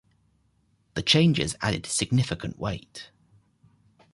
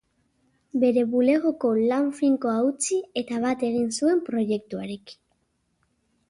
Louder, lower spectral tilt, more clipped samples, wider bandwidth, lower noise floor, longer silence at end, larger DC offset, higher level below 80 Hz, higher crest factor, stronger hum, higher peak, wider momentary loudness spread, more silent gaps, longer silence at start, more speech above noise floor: about the same, -25 LUFS vs -24 LUFS; about the same, -4.5 dB/octave vs -4.5 dB/octave; neither; about the same, 11.5 kHz vs 11.5 kHz; second, -67 dBFS vs -72 dBFS; about the same, 1.1 s vs 1.15 s; neither; first, -50 dBFS vs -68 dBFS; first, 22 dB vs 16 dB; neither; about the same, -6 dBFS vs -8 dBFS; first, 17 LU vs 9 LU; neither; first, 0.95 s vs 0.75 s; second, 42 dB vs 48 dB